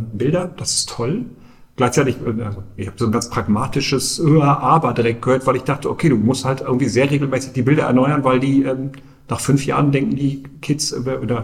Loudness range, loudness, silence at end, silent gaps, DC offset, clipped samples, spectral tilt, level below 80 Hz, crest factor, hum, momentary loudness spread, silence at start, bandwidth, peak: 4 LU; -18 LUFS; 0 s; none; under 0.1%; under 0.1%; -5.5 dB/octave; -44 dBFS; 16 dB; none; 9 LU; 0 s; 14.5 kHz; -2 dBFS